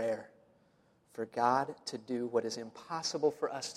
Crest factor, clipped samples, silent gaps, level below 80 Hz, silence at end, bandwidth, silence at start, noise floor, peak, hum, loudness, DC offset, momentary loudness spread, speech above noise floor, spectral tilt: 20 dB; under 0.1%; none; -80 dBFS; 0 s; 13.5 kHz; 0 s; -69 dBFS; -16 dBFS; none; -35 LUFS; under 0.1%; 12 LU; 34 dB; -3.5 dB/octave